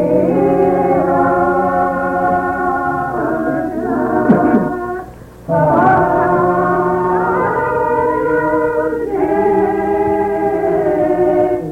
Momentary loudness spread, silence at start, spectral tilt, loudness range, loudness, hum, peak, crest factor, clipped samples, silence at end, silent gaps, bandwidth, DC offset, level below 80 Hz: 6 LU; 0 s; -9 dB/octave; 2 LU; -15 LUFS; none; 0 dBFS; 14 dB; under 0.1%; 0 s; none; 15.5 kHz; under 0.1%; -40 dBFS